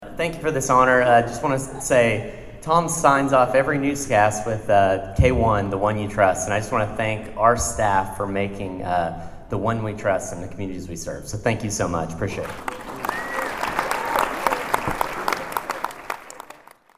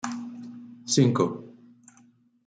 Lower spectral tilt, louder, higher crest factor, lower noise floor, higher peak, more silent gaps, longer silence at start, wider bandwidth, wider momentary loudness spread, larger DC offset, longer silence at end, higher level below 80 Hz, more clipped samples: about the same, -5 dB/octave vs -5 dB/octave; first, -22 LUFS vs -25 LUFS; about the same, 22 dB vs 20 dB; second, -46 dBFS vs -60 dBFS; first, 0 dBFS vs -8 dBFS; neither; about the same, 0 s vs 0.05 s; first, 16 kHz vs 9.4 kHz; second, 14 LU vs 20 LU; neither; second, 0.55 s vs 0.95 s; first, -40 dBFS vs -68 dBFS; neither